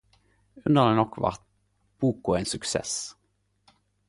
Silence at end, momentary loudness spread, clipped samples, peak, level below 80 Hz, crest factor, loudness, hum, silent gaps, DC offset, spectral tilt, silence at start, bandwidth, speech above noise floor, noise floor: 1 s; 12 LU; under 0.1%; -6 dBFS; -54 dBFS; 22 dB; -26 LUFS; 50 Hz at -60 dBFS; none; under 0.1%; -5 dB/octave; 0.55 s; 11.5 kHz; 47 dB; -72 dBFS